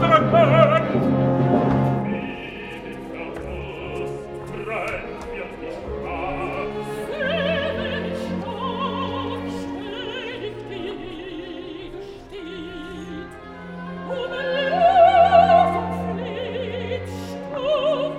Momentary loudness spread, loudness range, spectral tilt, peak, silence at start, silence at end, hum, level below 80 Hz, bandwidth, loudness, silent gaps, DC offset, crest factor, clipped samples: 19 LU; 14 LU; -7 dB/octave; -2 dBFS; 0 s; 0 s; none; -46 dBFS; 12 kHz; -22 LUFS; none; under 0.1%; 20 dB; under 0.1%